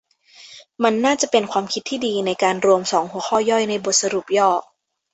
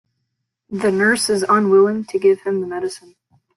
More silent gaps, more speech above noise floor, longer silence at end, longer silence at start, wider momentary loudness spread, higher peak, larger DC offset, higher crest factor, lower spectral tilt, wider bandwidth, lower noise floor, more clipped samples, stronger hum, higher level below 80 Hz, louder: neither; second, 28 dB vs 58 dB; about the same, 0.5 s vs 0.6 s; second, 0.4 s vs 0.7 s; second, 6 LU vs 13 LU; about the same, -2 dBFS vs -4 dBFS; neither; about the same, 18 dB vs 14 dB; second, -2.5 dB/octave vs -4.5 dB/octave; second, 8.4 kHz vs 12.5 kHz; second, -47 dBFS vs -75 dBFS; neither; neither; about the same, -64 dBFS vs -60 dBFS; about the same, -19 LUFS vs -17 LUFS